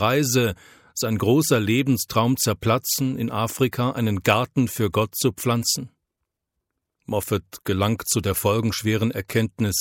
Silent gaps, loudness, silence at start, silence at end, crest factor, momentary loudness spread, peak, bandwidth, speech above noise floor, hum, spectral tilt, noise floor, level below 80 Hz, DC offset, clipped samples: none; -22 LUFS; 0 s; 0 s; 22 dB; 7 LU; -2 dBFS; 17 kHz; 59 dB; none; -4.5 dB/octave; -81 dBFS; -54 dBFS; under 0.1%; under 0.1%